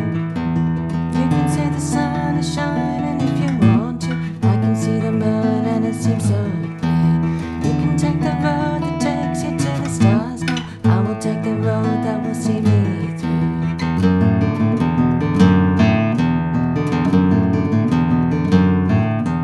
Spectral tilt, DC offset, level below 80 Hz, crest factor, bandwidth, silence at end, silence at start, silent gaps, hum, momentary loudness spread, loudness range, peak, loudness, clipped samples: -7.5 dB/octave; under 0.1%; -36 dBFS; 16 dB; 12 kHz; 0 s; 0 s; none; none; 6 LU; 3 LU; 0 dBFS; -18 LUFS; under 0.1%